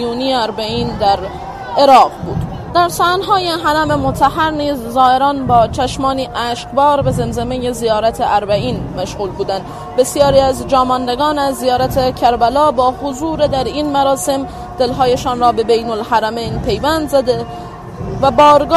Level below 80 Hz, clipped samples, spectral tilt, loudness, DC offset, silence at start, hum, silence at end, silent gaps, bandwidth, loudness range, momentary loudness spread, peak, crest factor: -34 dBFS; under 0.1%; -5 dB/octave; -14 LUFS; under 0.1%; 0 s; none; 0 s; none; 13.5 kHz; 3 LU; 10 LU; 0 dBFS; 14 dB